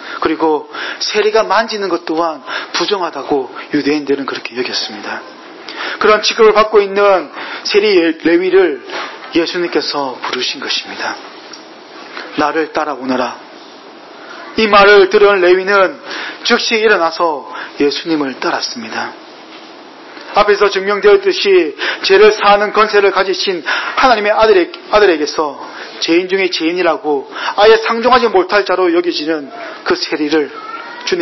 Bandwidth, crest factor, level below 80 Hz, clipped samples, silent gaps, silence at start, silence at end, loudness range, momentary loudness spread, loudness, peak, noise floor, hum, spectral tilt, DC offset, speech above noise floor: 6.2 kHz; 14 dB; -50 dBFS; under 0.1%; none; 0 s; 0 s; 8 LU; 15 LU; -13 LUFS; 0 dBFS; -35 dBFS; none; -3.5 dB/octave; under 0.1%; 22 dB